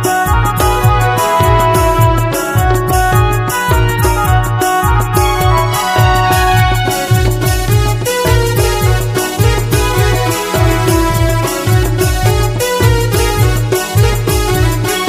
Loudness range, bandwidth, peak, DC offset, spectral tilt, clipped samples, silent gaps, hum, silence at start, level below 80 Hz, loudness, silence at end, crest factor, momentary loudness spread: 1 LU; 16 kHz; 0 dBFS; under 0.1%; -5 dB/octave; under 0.1%; none; none; 0 s; -18 dBFS; -12 LUFS; 0 s; 10 dB; 3 LU